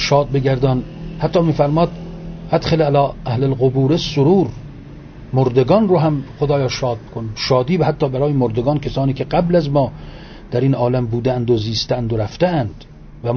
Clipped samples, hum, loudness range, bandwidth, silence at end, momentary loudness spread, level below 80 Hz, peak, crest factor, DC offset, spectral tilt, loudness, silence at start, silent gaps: under 0.1%; none; 2 LU; 6.8 kHz; 0 s; 13 LU; -38 dBFS; -2 dBFS; 16 dB; under 0.1%; -7.5 dB/octave; -17 LUFS; 0 s; none